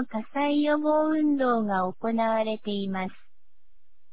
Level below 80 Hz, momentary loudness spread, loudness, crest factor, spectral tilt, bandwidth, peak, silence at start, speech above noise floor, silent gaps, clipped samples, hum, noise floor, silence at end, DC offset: -70 dBFS; 8 LU; -26 LUFS; 12 dB; -10 dB/octave; 4 kHz; -14 dBFS; 0 s; 43 dB; none; under 0.1%; none; -69 dBFS; 1 s; 1%